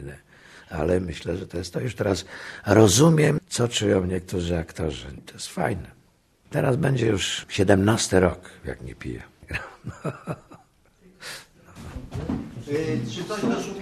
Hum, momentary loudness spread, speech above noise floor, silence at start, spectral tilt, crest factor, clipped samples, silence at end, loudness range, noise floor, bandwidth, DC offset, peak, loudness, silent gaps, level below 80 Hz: none; 19 LU; 36 dB; 0 s; -5 dB/octave; 22 dB; under 0.1%; 0 s; 15 LU; -60 dBFS; 13 kHz; under 0.1%; -2 dBFS; -24 LUFS; none; -46 dBFS